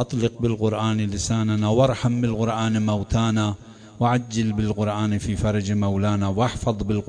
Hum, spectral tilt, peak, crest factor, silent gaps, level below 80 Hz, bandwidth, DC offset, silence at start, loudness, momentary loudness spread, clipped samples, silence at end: none; -6.5 dB/octave; -6 dBFS; 14 dB; none; -40 dBFS; 10 kHz; under 0.1%; 0 s; -23 LUFS; 4 LU; under 0.1%; 0 s